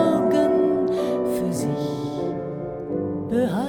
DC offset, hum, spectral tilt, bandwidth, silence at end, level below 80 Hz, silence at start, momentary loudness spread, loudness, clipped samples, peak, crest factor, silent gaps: under 0.1%; none; -7 dB/octave; 18.5 kHz; 0 s; -54 dBFS; 0 s; 9 LU; -23 LUFS; under 0.1%; -8 dBFS; 14 dB; none